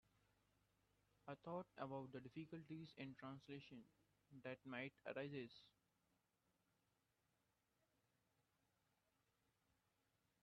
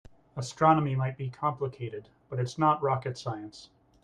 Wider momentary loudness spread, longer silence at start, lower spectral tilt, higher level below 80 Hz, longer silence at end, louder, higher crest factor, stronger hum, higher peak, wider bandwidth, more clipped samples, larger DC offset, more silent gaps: second, 10 LU vs 16 LU; first, 1.25 s vs 0.35 s; second, -5 dB/octave vs -7 dB/octave; second, -90 dBFS vs -64 dBFS; first, 4.75 s vs 0.4 s; second, -55 LUFS vs -29 LUFS; about the same, 22 dB vs 20 dB; neither; second, -38 dBFS vs -10 dBFS; second, 6.2 kHz vs 10 kHz; neither; neither; neither